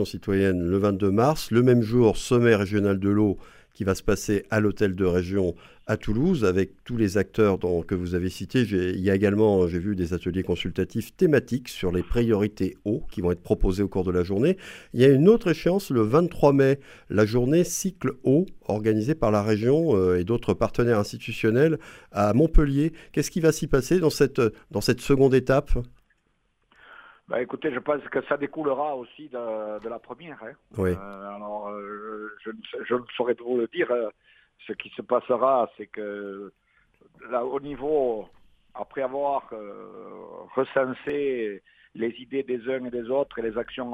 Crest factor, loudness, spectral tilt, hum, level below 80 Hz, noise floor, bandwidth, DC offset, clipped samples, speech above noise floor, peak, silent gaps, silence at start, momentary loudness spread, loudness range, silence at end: 20 dB; -24 LUFS; -6.5 dB/octave; none; -38 dBFS; -70 dBFS; 16 kHz; under 0.1%; under 0.1%; 46 dB; -6 dBFS; none; 0 s; 15 LU; 9 LU; 0 s